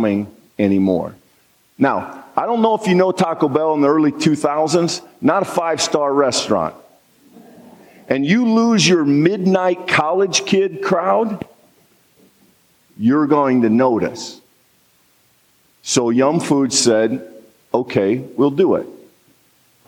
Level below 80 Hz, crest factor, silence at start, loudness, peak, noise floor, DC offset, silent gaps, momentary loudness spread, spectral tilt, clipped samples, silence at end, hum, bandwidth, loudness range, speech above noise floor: -64 dBFS; 16 dB; 0 s; -16 LUFS; -2 dBFS; -57 dBFS; under 0.1%; none; 9 LU; -4.5 dB/octave; under 0.1%; 0.9 s; none; 16 kHz; 4 LU; 41 dB